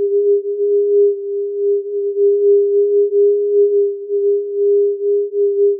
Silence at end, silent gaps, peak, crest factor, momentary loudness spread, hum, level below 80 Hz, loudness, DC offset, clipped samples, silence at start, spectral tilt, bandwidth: 0 s; none; -6 dBFS; 8 dB; 6 LU; none; under -90 dBFS; -15 LUFS; under 0.1%; under 0.1%; 0 s; -2.5 dB/octave; 0.6 kHz